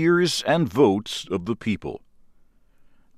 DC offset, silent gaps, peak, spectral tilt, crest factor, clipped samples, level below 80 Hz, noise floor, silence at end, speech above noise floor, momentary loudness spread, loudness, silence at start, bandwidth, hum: under 0.1%; none; -6 dBFS; -5 dB/octave; 18 dB; under 0.1%; -56 dBFS; -55 dBFS; 1.2 s; 33 dB; 12 LU; -23 LUFS; 0 s; 15.5 kHz; none